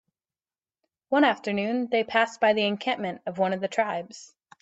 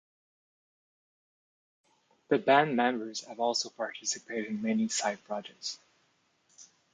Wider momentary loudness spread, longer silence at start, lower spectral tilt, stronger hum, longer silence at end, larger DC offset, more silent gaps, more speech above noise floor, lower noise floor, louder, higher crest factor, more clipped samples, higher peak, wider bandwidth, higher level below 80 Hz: second, 9 LU vs 15 LU; second, 1.1 s vs 2.3 s; first, -5 dB/octave vs -3 dB/octave; neither; about the same, 0.35 s vs 0.3 s; neither; neither; first, over 65 dB vs 41 dB; first, under -90 dBFS vs -72 dBFS; first, -25 LUFS vs -31 LUFS; about the same, 20 dB vs 22 dB; neither; about the same, -8 dBFS vs -10 dBFS; second, 8.2 kHz vs 9.6 kHz; first, -74 dBFS vs -84 dBFS